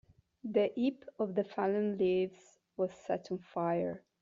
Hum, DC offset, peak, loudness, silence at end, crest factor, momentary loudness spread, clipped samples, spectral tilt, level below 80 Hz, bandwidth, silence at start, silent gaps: none; under 0.1%; -16 dBFS; -35 LUFS; 0.25 s; 18 dB; 8 LU; under 0.1%; -6 dB/octave; -76 dBFS; 7.6 kHz; 0.45 s; none